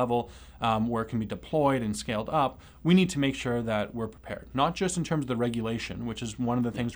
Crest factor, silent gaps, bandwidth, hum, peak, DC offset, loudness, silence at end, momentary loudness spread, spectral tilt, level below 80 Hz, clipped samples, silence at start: 18 dB; none; over 20 kHz; none; -10 dBFS; under 0.1%; -29 LUFS; 0 s; 10 LU; -6 dB/octave; -50 dBFS; under 0.1%; 0 s